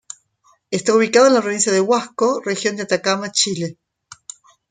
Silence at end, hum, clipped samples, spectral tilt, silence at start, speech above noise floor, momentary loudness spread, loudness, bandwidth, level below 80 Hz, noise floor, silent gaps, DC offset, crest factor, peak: 1 s; none; under 0.1%; -3 dB/octave; 0.7 s; 42 dB; 24 LU; -17 LUFS; 9.6 kHz; -66 dBFS; -59 dBFS; none; under 0.1%; 18 dB; -2 dBFS